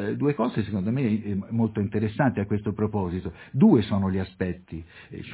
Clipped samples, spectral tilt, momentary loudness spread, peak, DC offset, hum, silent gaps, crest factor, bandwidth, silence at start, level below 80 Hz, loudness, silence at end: under 0.1%; -12 dB/octave; 14 LU; -8 dBFS; under 0.1%; none; none; 18 dB; 4 kHz; 0 s; -46 dBFS; -25 LUFS; 0 s